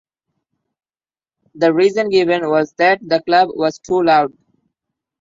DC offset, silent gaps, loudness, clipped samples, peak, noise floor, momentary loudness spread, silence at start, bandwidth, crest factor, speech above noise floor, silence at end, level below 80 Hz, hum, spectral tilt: under 0.1%; none; -15 LUFS; under 0.1%; -2 dBFS; under -90 dBFS; 4 LU; 1.55 s; 7.6 kHz; 16 dB; over 75 dB; 0.95 s; -62 dBFS; none; -5.5 dB/octave